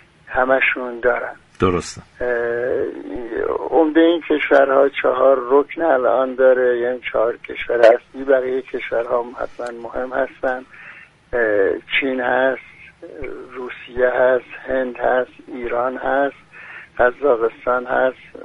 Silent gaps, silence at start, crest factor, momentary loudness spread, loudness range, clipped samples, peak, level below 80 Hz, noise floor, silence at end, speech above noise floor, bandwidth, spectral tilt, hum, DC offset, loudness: none; 0.3 s; 18 dB; 16 LU; 6 LU; under 0.1%; 0 dBFS; -48 dBFS; -39 dBFS; 0 s; 21 dB; 10.5 kHz; -5.5 dB/octave; none; under 0.1%; -18 LUFS